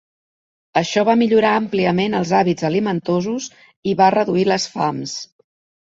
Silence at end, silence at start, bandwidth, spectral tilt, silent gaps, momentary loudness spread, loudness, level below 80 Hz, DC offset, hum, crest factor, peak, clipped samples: 0.7 s; 0.75 s; 7.8 kHz; -5.5 dB/octave; 3.76-3.83 s; 12 LU; -18 LUFS; -58 dBFS; under 0.1%; none; 18 dB; -2 dBFS; under 0.1%